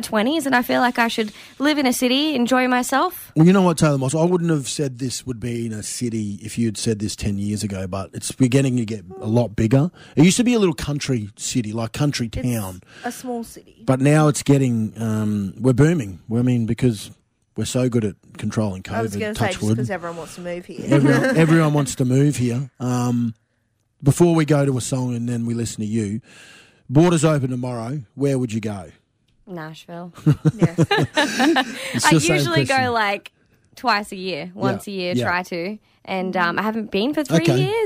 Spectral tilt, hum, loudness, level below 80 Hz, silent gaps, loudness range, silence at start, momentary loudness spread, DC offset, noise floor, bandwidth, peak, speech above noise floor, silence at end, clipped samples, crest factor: -5.5 dB/octave; none; -20 LUFS; -48 dBFS; none; 6 LU; 0 s; 13 LU; under 0.1%; -68 dBFS; 16 kHz; -4 dBFS; 48 dB; 0 s; under 0.1%; 16 dB